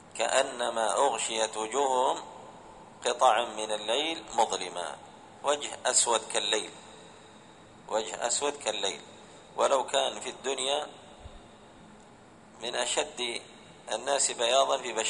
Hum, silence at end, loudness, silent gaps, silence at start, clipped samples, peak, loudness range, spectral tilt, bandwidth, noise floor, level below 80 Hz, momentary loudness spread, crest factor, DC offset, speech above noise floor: none; 0 s; -29 LUFS; none; 0 s; under 0.1%; -8 dBFS; 5 LU; -0.5 dB/octave; 10.5 kHz; -54 dBFS; -66 dBFS; 21 LU; 22 dB; under 0.1%; 25 dB